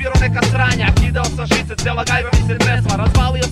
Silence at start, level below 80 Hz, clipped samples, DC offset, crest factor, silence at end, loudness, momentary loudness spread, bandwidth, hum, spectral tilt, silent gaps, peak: 0 s; -20 dBFS; under 0.1%; under 0.1%; 14 dB; 0 s; -16 LUFS; 3 LU; 14 kHz; none; -5 dB/octave; none; -2 dBFS